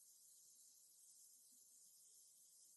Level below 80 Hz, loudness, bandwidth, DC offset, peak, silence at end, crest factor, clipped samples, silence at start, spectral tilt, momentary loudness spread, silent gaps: under -90 dBFS; -66 LUFS; 12 kHz; under 0.1%; -54 dBFS; 0 s; 16 dB; under 0.1%; 0 s; 2 dB/octave; 1 LU; none